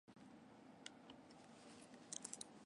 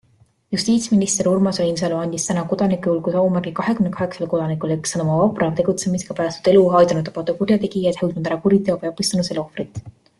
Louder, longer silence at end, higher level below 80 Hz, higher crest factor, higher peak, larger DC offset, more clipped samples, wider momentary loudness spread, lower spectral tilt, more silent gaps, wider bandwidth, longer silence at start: second, -57 LUFS vs -19 LUFS; second, 0 s vs 0.3 s; second, -88 dBFS vs -54 dBFS; first, 30 dB vs 16 dB; second, -28 dBFS vs -2 dBFS; neither; neither; first, 12 LU vs 8 LU; second, -2 dB/octave vs -5.5 dB/octave; neither; about the same, 11.5 kHz vs 12.5 kHz; second, 0.05 s vs 0.5 s